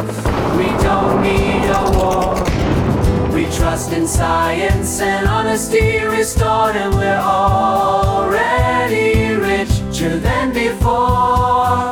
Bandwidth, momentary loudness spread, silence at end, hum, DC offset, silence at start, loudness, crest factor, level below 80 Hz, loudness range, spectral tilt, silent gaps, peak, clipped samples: 18.5 kHz; 3 LU; 0 s; none; under 0.1%; 0 s; -15 LUFS; 12 dB; -24 dBFS; 1 LU; -5.5 dB/octave; none; -4 dBFS; under 0.1%